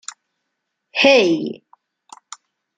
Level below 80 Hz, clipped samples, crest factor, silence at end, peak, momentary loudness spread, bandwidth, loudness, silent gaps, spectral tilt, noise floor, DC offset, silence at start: -70 dBFS; under 0.1%; 20 dB; 1.2 s; -2 dBFS; 26 LU; 9.6 kHz; -15 LUFS; none; -3.5 dB/octave; -76 dBFS; under 0.1%; 0.95 s